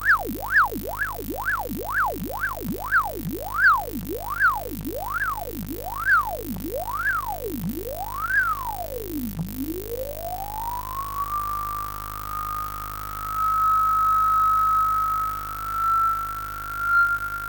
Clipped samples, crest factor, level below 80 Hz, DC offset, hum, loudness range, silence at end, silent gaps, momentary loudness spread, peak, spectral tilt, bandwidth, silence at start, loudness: under 0.1%; 16 dB; -42 dBFS; under 0.1%; 50 Hz at -65 dBFS; 8 LU; 0 s; none; 12 LU; -10 dBFS; -4.5 dB/octave; 17.5 kHz; 0 s; -24 LUFS